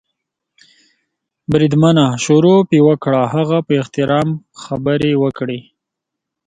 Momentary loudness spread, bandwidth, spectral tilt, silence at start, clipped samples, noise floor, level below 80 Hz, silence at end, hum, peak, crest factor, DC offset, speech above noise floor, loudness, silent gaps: 13 LU; 9.4 kHz; -6.5 dB/octave; 1.5 s; under 0.1%; -80 dBFS; -50 dBFS; 0.85 s; none; 0 dBFS; 14 dB; under 0.1%; 67 dB; -14 LUFS; none